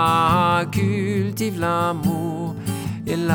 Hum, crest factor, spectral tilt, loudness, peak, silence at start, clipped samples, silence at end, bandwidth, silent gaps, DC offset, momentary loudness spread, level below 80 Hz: none; 14 dB; -6 dB/octave; -21 LUFS; -6 dBFS; 0 s; under 0.1%; 0 s; over 20 kHz; none; under 0.1%; 10 LU; -48 dBFS